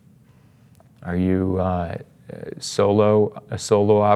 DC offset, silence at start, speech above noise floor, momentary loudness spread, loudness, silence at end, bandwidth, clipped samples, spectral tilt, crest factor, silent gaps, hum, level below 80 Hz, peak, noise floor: under 0.1%; 1 s; 33 dB; 19 LU; -21 LUFS; 0 s; 12.5 kHz; under 0.1%; -6.5 dB/octave; 18 dB; none; none; -58 dBFS; -4 dBFS; -52 dBFS